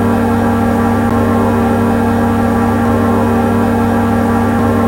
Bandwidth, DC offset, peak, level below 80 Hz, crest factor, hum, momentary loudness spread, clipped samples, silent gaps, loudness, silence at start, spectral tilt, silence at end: 16 kHz; under 0.1%; 0 dBFS; -28 dBFS; 12 dB; none; 1 LU; under 0.1%; none; -12 LUFS; 0 s; -7.5 dB/octave; 0 s